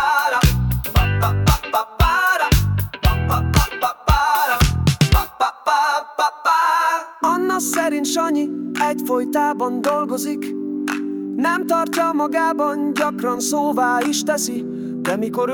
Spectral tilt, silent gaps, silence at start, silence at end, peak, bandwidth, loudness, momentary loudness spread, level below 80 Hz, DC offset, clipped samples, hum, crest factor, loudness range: -5 dB/octave; none; 0 s; 0 s; -4 dBFS; 19 kHz; -19 LUFS; 7 LU; -28 dBFS; under 0.1%; under 0.1%; none; 14 dB; 3 LU